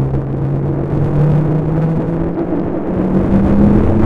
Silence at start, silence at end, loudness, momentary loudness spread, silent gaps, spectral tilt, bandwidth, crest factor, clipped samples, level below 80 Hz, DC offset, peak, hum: 0 s; 0 s; -15 LUFS; 7 LU; none; -11 dB/octave; 4.7 kHz; 14 dB; under 0.1%; -26 dBFS; under 0.1%; 0 dBFS; none